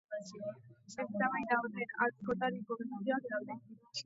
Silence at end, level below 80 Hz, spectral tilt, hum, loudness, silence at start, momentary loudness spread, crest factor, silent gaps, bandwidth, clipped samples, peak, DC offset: 0 s; -76 dBFS; -3.5 dB/octave; none; -38 LUFS; 0.1 s; 12 LU; 22 dB; none; 7.6 kHz; under 0.1%; -16 dBFS; under 0.1%